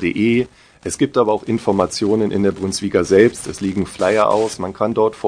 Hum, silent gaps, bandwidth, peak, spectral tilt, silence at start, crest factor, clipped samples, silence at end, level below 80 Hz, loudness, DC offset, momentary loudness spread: none; none; 10 kHz; 0 dBFS; -5.5 dB/octave; 0 s; 16 dB; under 0.1%; 0 s; -48 dBFS; -17 LUFS; under 0.1%; 8 LU